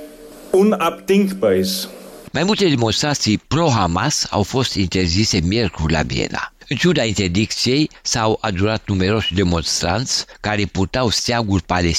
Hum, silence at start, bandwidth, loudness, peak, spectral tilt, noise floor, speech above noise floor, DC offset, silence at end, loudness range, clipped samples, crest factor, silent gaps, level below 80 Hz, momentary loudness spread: none; 0 s; 16 kHz; -18 LUFS; -4 dBFS; -4.5 dB/octave; -38 dBFS; 20 dB; under 0.1%; 0 s; 1 LU; under 0.1%; 14 dB; none; -36 dBFS; 5 LU